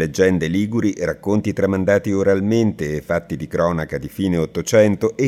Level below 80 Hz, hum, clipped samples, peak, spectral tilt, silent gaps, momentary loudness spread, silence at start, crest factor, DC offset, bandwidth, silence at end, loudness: -48 dBFS; none; under 0.1%; -2 dBFS; -6.5 dB/octave; none; 7 LU; 0 s; 16 dB; under 0.1%; 15.5 kHz; 0 s; -19 LUFS